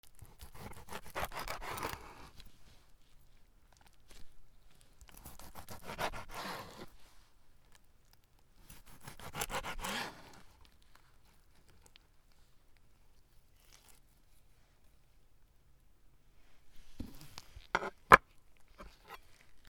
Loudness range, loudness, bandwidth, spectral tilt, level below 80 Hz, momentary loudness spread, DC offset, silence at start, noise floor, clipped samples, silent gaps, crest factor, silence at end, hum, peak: 25 LU; -34 LUFS; over 20 kHz; -3 dB/octave; -58 dBFS; 19 LU; under 0.1%; 0.05 s; -64 dBFS; under 0.1%; none; 40 dB; 0 s; none; -2 dBFS